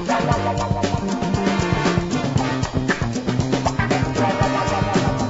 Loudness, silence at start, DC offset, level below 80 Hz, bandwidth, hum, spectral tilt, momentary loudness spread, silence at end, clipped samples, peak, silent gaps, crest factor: -21 LUFS; 0 s; under 0.1%; -36 dBFS; 8 kHz; none; -6 dB/octave; 3 LU; 0 s; under 0.1%; -4 dBFS; none; 16 dB